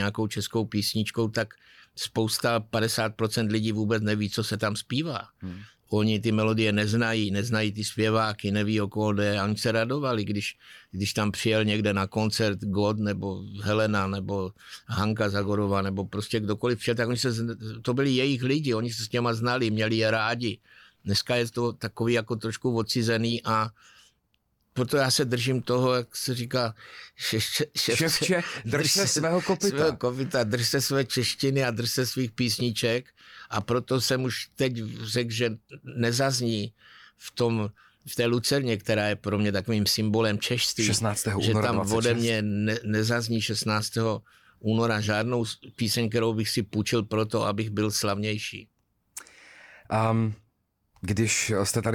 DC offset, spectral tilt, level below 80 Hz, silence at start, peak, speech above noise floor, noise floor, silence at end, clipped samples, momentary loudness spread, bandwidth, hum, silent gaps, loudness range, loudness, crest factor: under 0.1%; -4.5 dB/octave; -60 dBFS; 0 s; -12 dBFS; 46 dB; -72 dBFS; 0 s; under 0.1%; 8 LU; 18.5 kHz; none; none; 4 LU; -26 LUFS; 14 dB